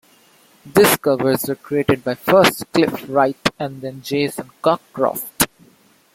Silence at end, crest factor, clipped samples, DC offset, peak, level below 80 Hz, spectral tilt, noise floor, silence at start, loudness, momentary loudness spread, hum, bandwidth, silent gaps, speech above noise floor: 0.7 s; 18 dB; under 0.1%; under 0.1%; 0 dBFS; -52 dBFS; -4 dB/octave; -53 dBFS; 0.65 s; -18 LUFS; 9 LU; none; 16.5 kHz; none; 36 dB